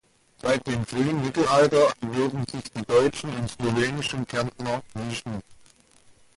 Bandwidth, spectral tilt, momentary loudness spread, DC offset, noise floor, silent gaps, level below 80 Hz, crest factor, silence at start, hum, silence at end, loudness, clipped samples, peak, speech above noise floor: 11.5 kHz; -5.5 dB/octave; 13 LU; under 0.1%; -56 dBFS; none; -54 dBFS; 18 dB; 0.45 s; none; 0.8 s; -25 LUFS; under 0.1%; -8 dBFS; 32 dB